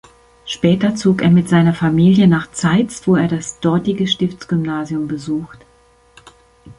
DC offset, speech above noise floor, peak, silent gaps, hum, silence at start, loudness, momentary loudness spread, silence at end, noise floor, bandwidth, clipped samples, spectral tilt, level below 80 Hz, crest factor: under 0.1%; 37 dB; -2 dBFS; none; none; 0.45 s; -16 LUFS; 10 LU; 0.05 s; -52 dBFS; 11 kHz; under 0.1%; -6.5 dB/octave; -48 dBFS; 14 dB